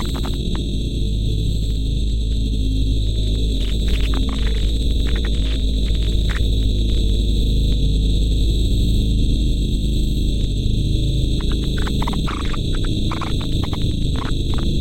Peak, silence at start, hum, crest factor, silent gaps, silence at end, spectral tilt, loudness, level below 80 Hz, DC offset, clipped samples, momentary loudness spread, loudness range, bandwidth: -6 dBFS; 0 s; none; 12 dB; none; 0 s; -6 dB/octave; -21 LUFS; -20 dBFS; under 0.1%; under 0.1%; 3 LU; 2 LU; 12.5 kHz